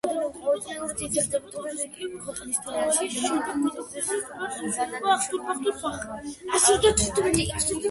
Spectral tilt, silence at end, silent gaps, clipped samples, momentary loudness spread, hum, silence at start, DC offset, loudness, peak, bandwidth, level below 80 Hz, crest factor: -2.5 dB/octave; 0 s; none; under 0.1%; 12 LU; none; 0.05 s; under 0.1%; -26 LUFS; -4 dBFS; 12 kHz; -46 dBFS; 22 dB